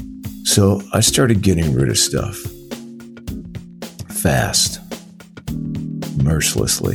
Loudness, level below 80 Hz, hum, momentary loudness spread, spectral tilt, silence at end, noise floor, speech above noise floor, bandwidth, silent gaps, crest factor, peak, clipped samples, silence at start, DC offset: -17 LUFS; -36 dBFS; none; 19 LU; -4 dB/octave; 0 s; -39 dBFS; 23 dB; 19 kHz; none; 18 dB; -2 dBFS; under 0.1%; 0 s; under 0.1%